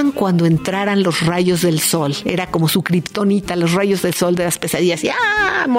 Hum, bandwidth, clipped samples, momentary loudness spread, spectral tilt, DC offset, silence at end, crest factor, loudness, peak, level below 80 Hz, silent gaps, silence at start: none; 16.5 kHz; under 0.1%; 3 LU; -5 dB/octave; under 0.1%; 0 s; 16 dB; -16 LUFS; 0 dBFS; -48 dBFS; none; 0 s